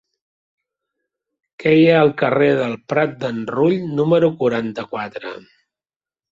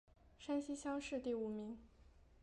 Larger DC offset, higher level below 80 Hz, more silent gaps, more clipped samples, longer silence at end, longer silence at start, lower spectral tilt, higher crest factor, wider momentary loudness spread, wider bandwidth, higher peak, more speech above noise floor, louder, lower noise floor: neither; first, -60 dBFS vs -68 dBFS; neither; neither; first, 0.9 s vs 0 s; first, 1.6 s vs 0.25 s; first, -8 dB/octave vs -5 dB/octave; about the same, 16 dB vs 16 dB; first, 14 LU vs 11 LU; second, 7.6 kHz vs 11.5 kHz; first, -2 dBFS vs -30 dBFS; first, over 73 dB vs 23 dB; first, -17 LUFS vs -44 LUFS; first, under -90 dBFS vs -66 dBFS